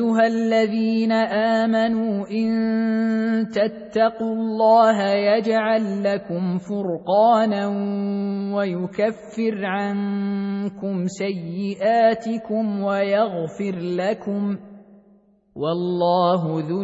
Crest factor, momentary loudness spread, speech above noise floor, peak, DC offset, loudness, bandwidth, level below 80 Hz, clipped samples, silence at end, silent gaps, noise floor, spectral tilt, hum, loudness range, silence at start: 16 dB; 8 LU; 35 dB; -4 dBFS; under 0.1%; -21 LUFS; 8 kHz; -64 dBFS; under 0.1%; 0 s; none; -56 dBFS; -7 dB/octave; none; 5 LU; 0 s